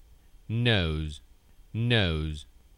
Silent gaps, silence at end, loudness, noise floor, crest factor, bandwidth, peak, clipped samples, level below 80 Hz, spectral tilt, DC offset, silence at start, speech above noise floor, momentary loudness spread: none; 0.35 s; -28 LUFS; -50 dBFS; 18 dB; 11 kHz; -10 dBFS; under 0.1%; -42 dBFS; -6.5 dB/octave; under 0.1%; 0.5 s; 23 dB; 15 LU